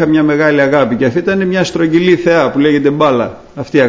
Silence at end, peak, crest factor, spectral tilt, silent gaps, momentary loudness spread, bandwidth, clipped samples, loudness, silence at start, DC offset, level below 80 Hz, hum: 0 s; 0 dBFS; 10 dB; -6.5 dB/octave; none; 5 LU; 8 kHz; under 0.1%; -11 LUFS; 0 s; under 0.1%; -46 dBFS; none